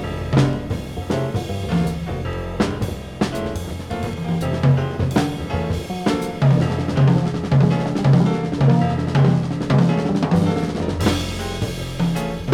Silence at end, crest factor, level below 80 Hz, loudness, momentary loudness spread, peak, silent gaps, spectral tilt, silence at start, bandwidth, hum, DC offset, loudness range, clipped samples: 0 s; 16 dB; -36 dBFS; -20 LUFS; 9 LU; -2 dBFS; none; -7 dB/octave; 0 s; 14 kHz; none; under 0.1%; 6 LU; under 0.1%